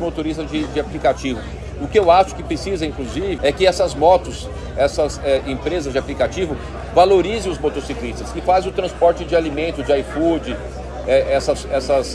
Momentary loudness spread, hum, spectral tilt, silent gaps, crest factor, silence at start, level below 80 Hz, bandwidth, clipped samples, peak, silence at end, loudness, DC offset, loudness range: 12 LU; none; -5.5 dB/octave; none; 18 dB; 0 s; -32 dBFS; 12 kHz; under 0.1%; -2 dBFS; 0 s; -19 LUFS; under 0.1%; 2 LU